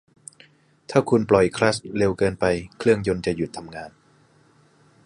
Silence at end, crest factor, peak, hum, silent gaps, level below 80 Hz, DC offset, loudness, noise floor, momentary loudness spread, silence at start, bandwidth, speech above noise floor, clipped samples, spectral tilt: 1.15 s; 22 dB; -2 dBFS; none; none; -50 dBFS; under 0.1%; -22 LUFS; -57 dBFS; 16 LU; 0.9 s; 11 kHz; 36 dB; under 0.1%; -6 dB/octave